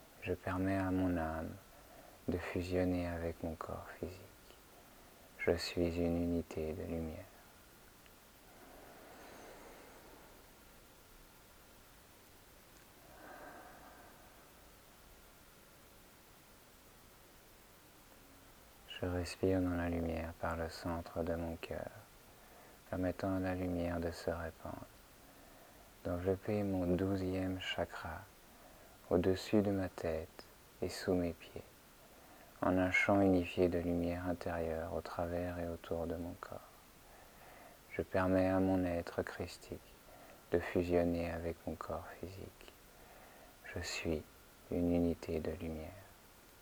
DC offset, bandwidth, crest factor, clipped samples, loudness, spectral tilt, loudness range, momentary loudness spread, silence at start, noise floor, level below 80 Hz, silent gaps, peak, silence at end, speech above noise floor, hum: under 0.1%; over 20 kHz; 22 dB; under 0.1%; -38 LUFS; -6.5 dB/octave; 22 LU; 25 LU; 0 s; -61 dBFS; -62 dBFS; none; -18 dBFS; 0 s; 24 dB; none